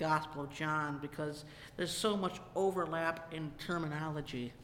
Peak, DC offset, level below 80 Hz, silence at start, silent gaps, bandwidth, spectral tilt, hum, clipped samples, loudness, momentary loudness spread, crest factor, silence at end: -20 dBFS; under 0.1%; -62 dBFS; 0 s; none; 16.5 kHz; -5 dB/octave; none; under 0.1%; -37 LUFS; 9 LU; 18 dB; 0 s